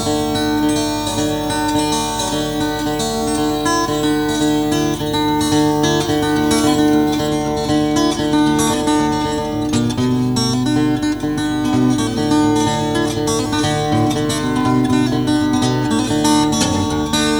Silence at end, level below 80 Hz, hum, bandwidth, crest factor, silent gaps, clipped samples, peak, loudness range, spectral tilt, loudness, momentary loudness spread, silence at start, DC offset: 0 s; -36 dBFS; none; over 20 kHz; 14 dB; none; under 0.1%; -2 dBFS; 2 LU; -4.5 dB/octave; -16 LUFS; 4 LU; 0 s; under 0.1%